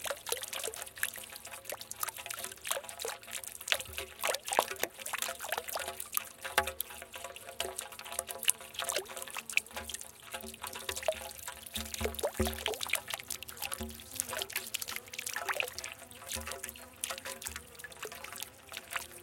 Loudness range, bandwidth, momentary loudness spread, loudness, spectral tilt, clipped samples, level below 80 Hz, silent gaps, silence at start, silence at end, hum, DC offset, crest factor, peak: 4 LU; 17 kHz; 10 LU; -37 LUFS; -1 dB/octave; under 0.1%; -58 dBFS; none; 0 s; 0 s; none; under 0.1%; 36 dB; -2 dBFS